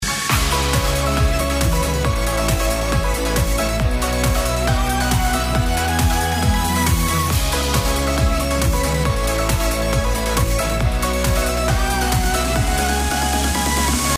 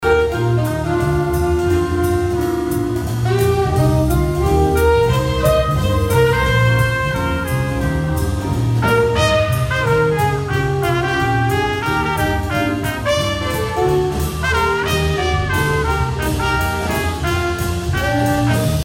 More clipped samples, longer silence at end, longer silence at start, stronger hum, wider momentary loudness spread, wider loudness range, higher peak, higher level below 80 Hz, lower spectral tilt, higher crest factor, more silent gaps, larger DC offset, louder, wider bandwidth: neither; about the same, 0 s vs 0 s; about the same, 0 s vs 0 s; neither; second, 2 LU vs 5 LU; about the same, 1 LU vs 3 LU; about the same, -4 dBFS vs -4 dBFS; about the same, -22 dBFS vs -26 dBFS; second, -4 dB/octave vs -6 dB/octave; about the same, 14 dB vs 12 dB; neither; neither; about the same, -19 LUFS vs -17 LUFS; about the same, 16 kHz vs 16.5 kHz